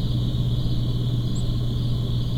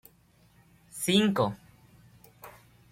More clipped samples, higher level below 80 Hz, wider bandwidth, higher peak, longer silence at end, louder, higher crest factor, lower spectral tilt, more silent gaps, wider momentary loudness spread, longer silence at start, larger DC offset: neither; first, -28 dBFS vs -66 dBFS; second, 8.6 kHz vs 16.5 kHz; about the same, -10 dBFS vs -12 dBFS; second, 0 s vs 0.4 s; about the same, -25 LUFS vs -27 LUFS; second, 12 dB vs 22 dB; first, -7.5 dB/octave vs -4.5 dB/octave; neither; second, 1 LU vs 26 LU; second, 0 s vs 0.95 s; neither